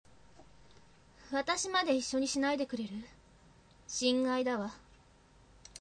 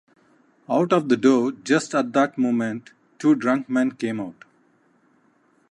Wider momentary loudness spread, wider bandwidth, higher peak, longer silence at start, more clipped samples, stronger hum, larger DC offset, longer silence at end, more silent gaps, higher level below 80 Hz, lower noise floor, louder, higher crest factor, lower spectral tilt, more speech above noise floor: first, 15 LU vs 10 LU; second, 9.8 kHz vs 11 kHz; second, -18 dBFS vs -4 dBFS; second, 0.4 s vs 0.7 s; neither; neither; neither; second, 1 s vs 1.4 s; neither; first, -66 dBFS vs -74 dBFS; about the same, -62 dBFS vs -62 dBFS; second, -33 LUFS vs -22 LUFS; about the same, 18 dB vs 18 dB; second, -2.5 dB/octave vs -5.5 dB/octave; second, 29 dB vs 41 dB